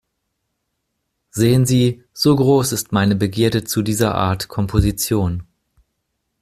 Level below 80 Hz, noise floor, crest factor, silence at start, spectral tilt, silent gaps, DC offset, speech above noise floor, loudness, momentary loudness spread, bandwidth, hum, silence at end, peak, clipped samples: -38 dBFS; -74 dBFS; 16 dB; 1.35 s; -5.5 dB/octave; none; under 0.1%; 57 dB; -17 LUFS; 6 LU; 15.5 kHz; none; 1 s; -2 dBFS; under 0.1%